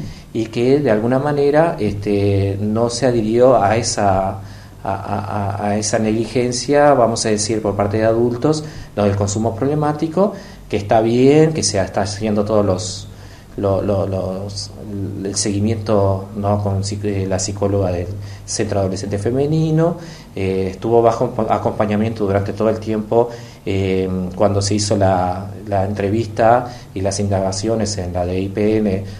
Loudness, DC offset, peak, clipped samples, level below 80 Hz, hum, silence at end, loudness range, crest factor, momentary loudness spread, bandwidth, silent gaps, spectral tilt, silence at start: -18 LUFS; under 0.1%; 0 dBFS; under 0.1%; -42 dBFS; none; 0 s; 4 LU; 18 dB; 10 LU; 12.5 kHz; none; -5.5 dB/octave; 0 s